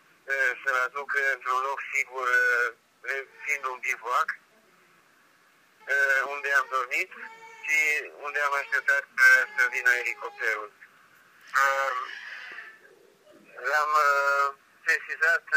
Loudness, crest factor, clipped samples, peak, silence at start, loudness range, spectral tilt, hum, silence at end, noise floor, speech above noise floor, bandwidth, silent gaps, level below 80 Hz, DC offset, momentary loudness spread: -25 LUFS; 20 dB; under 0.1%; -8 dBFS; 0.25 s; 7 LU; 1 dB/octave; none; 0 s; -61 dBFS; 35 dB; 15.5 kHz; none; under -90 dBFS; under 0.1%; 13 LU